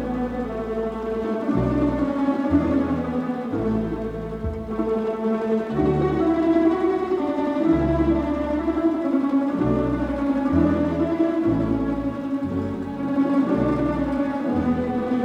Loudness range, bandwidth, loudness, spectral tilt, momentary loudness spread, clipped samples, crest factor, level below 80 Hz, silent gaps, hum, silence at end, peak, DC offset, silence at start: 3 LU; 8 kHz; -23 LUFS; -9 dB/octave; 7 LU; under 0.1%; 16 dB; -38 dBFS; none; none; 0 s; -6 dBFS; under 0.1%; 0 s